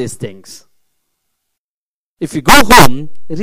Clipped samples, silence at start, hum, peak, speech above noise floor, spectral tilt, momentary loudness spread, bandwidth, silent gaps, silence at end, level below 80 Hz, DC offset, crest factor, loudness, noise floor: 1%; 0 s; none; 0 dBFS; over 81 dB; -3.5 dB/octave; 22 LU; over 20 kHz; 1.58-2.17 s; 0 s; -28 dBFS; under 0.1%; 12 dB; -8 LUFS; under -90 dBFS